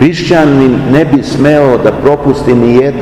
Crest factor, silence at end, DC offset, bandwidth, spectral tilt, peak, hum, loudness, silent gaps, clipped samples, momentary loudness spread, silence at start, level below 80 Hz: 8 dB; 0 s; under 0.1%; 12 kHz; -7.5 dB/octave; 0 dBFS; none; -8 LUFS; none; 7%; 3 LU; 0 s; -32 dBFS